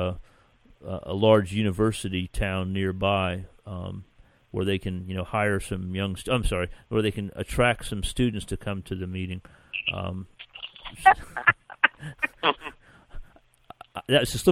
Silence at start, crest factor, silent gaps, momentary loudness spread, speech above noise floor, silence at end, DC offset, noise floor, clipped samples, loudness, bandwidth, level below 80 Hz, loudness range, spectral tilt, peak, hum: 0 s; 26 dB; none; 17 LU; 32 dB; 0 s; under 0.1%; -58 dBFS; under 0.1%; -26 LUFS; 16 kHz; -42 dBFS; 4 LU; -5 dB/octave; 0 dBFS; none